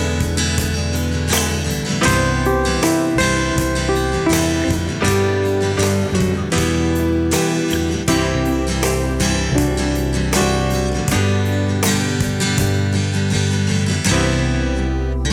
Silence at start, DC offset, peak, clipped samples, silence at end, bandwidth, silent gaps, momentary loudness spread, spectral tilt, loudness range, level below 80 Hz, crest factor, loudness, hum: 0 s; under 0.1%; -4 dBFS; under 0.1%; 0 s; 17 kHz; none; 3 LU; -4.5 dB/octave; 1 LU; -26 dBFS; 14 dB; -18 LUFS; none